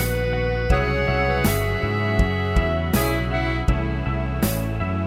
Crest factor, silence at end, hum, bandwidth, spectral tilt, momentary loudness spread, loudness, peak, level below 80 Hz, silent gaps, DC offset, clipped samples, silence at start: 16 dB; 0 s; none; 16 kHz; -6 dB/octave; 4 LU; -22 LUFS; -6 dBFS; -26 dBFS; none; under 0.1%; under 0.1%; 0 s